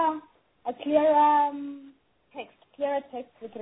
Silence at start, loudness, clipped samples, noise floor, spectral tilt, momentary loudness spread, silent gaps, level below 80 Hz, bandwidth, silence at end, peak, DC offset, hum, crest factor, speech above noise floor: 0 s; -25 LUFS; under 0.1%; -56 dBFS; -8 dB/octave; 23 LU; none; -70 dBFS; 4 kHz; 0 s; -10 dBFS; under 0.1%; none; 18 dB; 32 dB